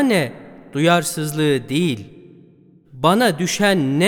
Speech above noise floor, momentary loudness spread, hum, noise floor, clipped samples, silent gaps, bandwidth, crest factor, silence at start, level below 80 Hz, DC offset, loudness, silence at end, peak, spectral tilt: 33 dB; 8 LU; none; -50 dBFS; under 0.1%; none; 18.5 kHz; 18 dB; 0 s; -56 dBFS; under 0.1%; -18 LUFS; 0 s; -2 dBFS; -5 dB/octave